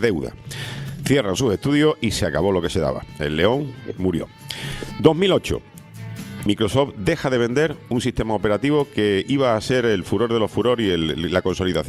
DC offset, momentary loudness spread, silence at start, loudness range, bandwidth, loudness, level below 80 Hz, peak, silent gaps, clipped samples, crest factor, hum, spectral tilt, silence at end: under 0.1%; 11 LU; 0 s; 2 LU; 15 kHz; -21 LUFS; -42 dBFS; 0 dBFS; none; under 0.1%; 20 dB; none; -5.5 dB/octave; 0 s